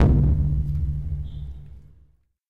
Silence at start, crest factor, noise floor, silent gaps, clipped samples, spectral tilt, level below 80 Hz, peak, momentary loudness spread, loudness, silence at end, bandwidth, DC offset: 0 s; 16 dB; -59 dBFS; none; under 0.1%; -10.5 dB/octave; -26 dBFS; -8 dBFS; 19 LU; -24 LUFS; 0 s; 3.8 kHz; under 0.1%